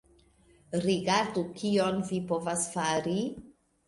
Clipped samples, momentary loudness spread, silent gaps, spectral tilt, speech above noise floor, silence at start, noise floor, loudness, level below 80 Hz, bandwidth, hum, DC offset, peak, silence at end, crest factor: under 0.1%; 6 LU; none; -4.5 dB/octave; 33 dB; 0.7 s; -62 dBFS; -30 LUFS; -64 dBFS; 11.5 kHz; none; under 0.1%; -12 dBFS; 0.35 s; 18 dB